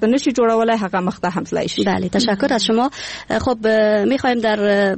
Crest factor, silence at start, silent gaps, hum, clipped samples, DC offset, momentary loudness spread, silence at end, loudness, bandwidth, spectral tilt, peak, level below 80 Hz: 10 dB; 0 s; none; none; under 0.1%; 0.1%; 6 LU; 0 s; -17 LUFS; 8.8 kHz; -5 dB/octave; -6 dBFS; -48 dBFS